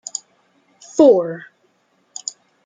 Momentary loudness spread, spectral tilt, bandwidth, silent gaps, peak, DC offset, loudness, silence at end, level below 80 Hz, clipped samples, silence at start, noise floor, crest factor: 21 LU; -4.5 dB/octave; 9.6 kHz; none; -2 dBFS; under 0.1%; -16 LUFS; 1.25 s; -70 dBFS; under 0.1%; 0.95 s; -62 dBFS; 18 dB